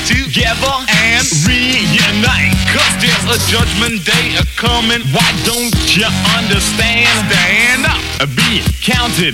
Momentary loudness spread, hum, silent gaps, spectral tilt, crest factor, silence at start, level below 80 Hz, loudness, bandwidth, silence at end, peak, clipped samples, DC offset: 4 LU; none; none; -3 dB/octave; 12 dB; 0 s; -26 dBFS; -11 LUFS; 16.5 kHz; 0 s; 0 dBFS; under 0.1%; under 0.1%